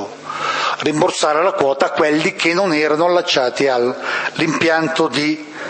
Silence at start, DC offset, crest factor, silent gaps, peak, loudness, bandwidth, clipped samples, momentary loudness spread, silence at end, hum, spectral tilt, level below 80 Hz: 0 s; under 0.1%; 16 dB; none; 0 dBFS; -16 LUFS; 8.8 kHz; under 0.1%; 5 LU; 0 s; none; -4 dB/octave; -64 dBFS